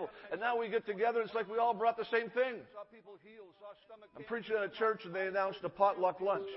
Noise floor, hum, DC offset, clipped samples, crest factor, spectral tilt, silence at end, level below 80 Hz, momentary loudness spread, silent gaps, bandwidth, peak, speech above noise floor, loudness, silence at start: -56 dBFS; none; under 0.1%; under 0.1%; 20 dB; -2.5 dB/octave; 0 s; -78 dBFS; 22 LU; none; 5.6 kHz; -16 dBFS; 22 dB; -35 LUFS; 0 s